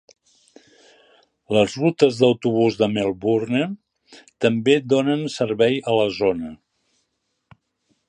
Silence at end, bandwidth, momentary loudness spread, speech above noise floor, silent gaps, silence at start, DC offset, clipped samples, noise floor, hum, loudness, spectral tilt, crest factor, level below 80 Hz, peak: 1.55 s; 10 kHz; 6 LU; 54 dB; none; 1.5 s; under 0.1%; under 0.1%; -74 dBFS; none; -20 LUFS; -6 dB/octave; 20 dB; -60 dBFS; -2 dBFS